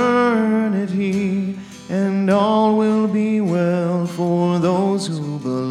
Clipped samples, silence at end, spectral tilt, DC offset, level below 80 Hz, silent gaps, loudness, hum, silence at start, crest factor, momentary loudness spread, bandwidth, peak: under 0.1%; 0 s; -7 dB/octave; under 0.1%; -64 dBFS; none; -19 LUFS; none; 0 s; 14 dB; 8 LU; 11 kHz; -4 dBFS